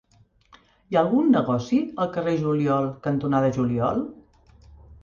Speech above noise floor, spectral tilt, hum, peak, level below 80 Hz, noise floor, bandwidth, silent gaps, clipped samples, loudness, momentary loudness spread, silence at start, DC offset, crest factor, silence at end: 37 dB; -8 dB/octave; none; -8 dBFS; -54 dBFS; -59 dBFS; 7 kHz; none; under 0.1%; -23 LUFS; 6 LU; 0.9 s; under 0.1%; 16 dB; 0.1 s